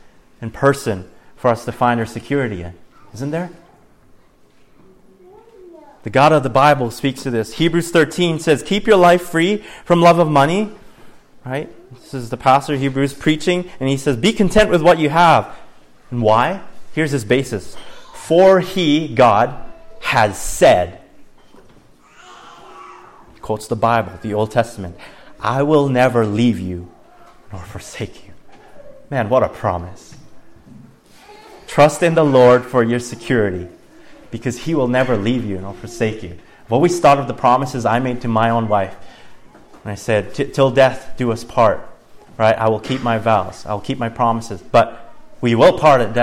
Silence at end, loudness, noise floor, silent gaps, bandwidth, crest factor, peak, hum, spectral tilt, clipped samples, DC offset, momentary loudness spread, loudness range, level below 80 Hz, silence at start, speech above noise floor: 0 s; -16 LUFS; -49 dBFS; none; 16 kHz; 16 dB; -2 dBFS; none; -6 dB/octave; under 0.1%; under 0.1%; 17 LU; 9 LU; -42 dBFS; 0.4 s; 34 dB